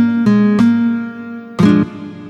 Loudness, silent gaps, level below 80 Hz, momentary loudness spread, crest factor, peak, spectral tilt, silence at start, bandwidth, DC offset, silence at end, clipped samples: -13 LUFS; none; -50 dBFS; 15 LU; 14 dB; 0 dBFS; -8 dB/octave; 0 s; 8 kHz; under 0.1%; 0 s; under 0.1%